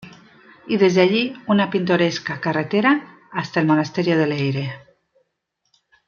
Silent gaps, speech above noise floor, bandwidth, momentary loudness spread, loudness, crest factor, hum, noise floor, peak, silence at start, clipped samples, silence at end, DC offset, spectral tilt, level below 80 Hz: none; 55 dB; 7.2 kHz; 10 LU; -19 LUFS; 18 dB; none; -73 dBFS; -2 dBFS; 0 s; under 0.1%; 1.3 s; under 0.1%; -6.5 dB/octave; -64 dBFS